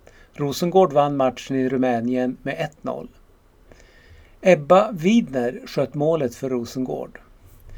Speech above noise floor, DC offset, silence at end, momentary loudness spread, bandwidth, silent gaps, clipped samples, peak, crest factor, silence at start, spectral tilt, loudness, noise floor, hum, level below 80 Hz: 32 dB; under 0.1%; 0 s; 12 LU; 18.5 kHz; none; under 0.1%; 0 dBFS; 20 dB; 0.4 s; -6.5 dB/octave; -21 LUFS; -53 dBFS; none; -52 dBFS